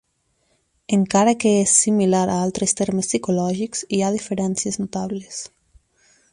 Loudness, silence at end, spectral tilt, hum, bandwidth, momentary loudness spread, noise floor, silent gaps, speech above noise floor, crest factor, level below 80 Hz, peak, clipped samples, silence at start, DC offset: -20 LUFS; 0.85 s; -4.5 dB/octave; none; 11.5 kHz; 13 LU; -67 dBFS; none; 47 dB; 18 dB; -56 dBFS; -2 dBFS; under 0.1%; 0.9 s; under 0.1%